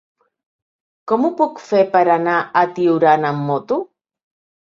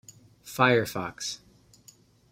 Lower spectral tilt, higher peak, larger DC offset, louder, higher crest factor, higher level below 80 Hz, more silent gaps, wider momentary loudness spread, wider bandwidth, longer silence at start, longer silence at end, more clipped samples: first, -7.5 dB/octave vs -4.5 dB/octave; first, -2 dBFS vs -8 dBFS; neither; first, -17 LUFS vs -26 LUFS; second, 16 dB vs 22 dB; about the same, -66 dBFS vs -64 dBFS; neither; second, 9 LU vs 17 LU; second, 7.4 kHz vs 16 kHz; first, 1.05 s vs 0.45 s; about the same, 0.85 s vs 0.95 s; neither